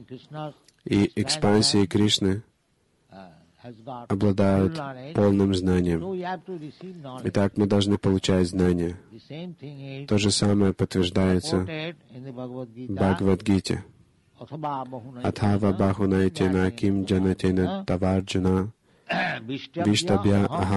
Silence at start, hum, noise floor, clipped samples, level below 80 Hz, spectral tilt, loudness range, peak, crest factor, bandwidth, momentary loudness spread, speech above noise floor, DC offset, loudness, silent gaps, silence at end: 0 s; none; -68 dBFS; under 0.1%; -42 dBFS; -5.5 dB/octave; 2 LU; -10 dBFS; 16 dB; 12 kHz; 17 LU; 44 dB; under 0.1%; -24 LUFS; none; 0 s